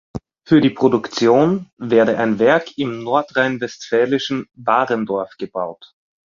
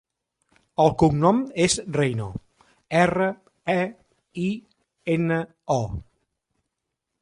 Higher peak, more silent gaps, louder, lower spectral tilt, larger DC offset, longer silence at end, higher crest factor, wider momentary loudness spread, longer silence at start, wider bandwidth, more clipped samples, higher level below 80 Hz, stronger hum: about the same, -2 dBFS vs -4 dBFS; first, 1.73-1.77 s vs none; first, -18 LUFS vs -23 LUFS; about the same, -6 dB/octave vs -5.5 dB/octave; neither; second, 0.5 s vs 1.2 s; about the same, 16 dB vs 20 dB; second, 11 LU vs 16 LU; second, 0.15 s vs 0.8 s; second, 7.4 kHz vs 11 kHz; neither; second, -56 dBFS vs -50 dBFS; neither